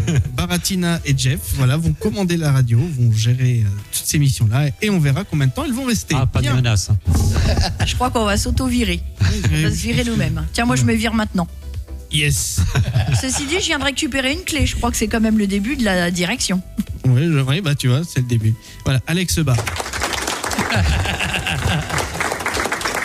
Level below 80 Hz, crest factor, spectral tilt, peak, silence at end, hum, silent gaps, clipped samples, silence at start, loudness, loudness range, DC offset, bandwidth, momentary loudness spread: -30 dBFS; 10 dB; -5 dB/octave; -8 dBFS; 0 s; none; none; under 0.1%; 0 s; -18 LUFS; 2 LU; under 0.1%; 15.5 kHz; 4 LU